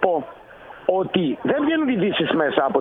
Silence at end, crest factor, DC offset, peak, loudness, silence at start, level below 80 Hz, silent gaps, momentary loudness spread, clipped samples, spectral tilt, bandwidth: 0 s; 18 dB; under 0.1%; -2 dBFS; -21 LUFS; 0 s; -58 dBFS; none; 8 LU; under 0.1%; -8.5 dB/octave; 4 kHz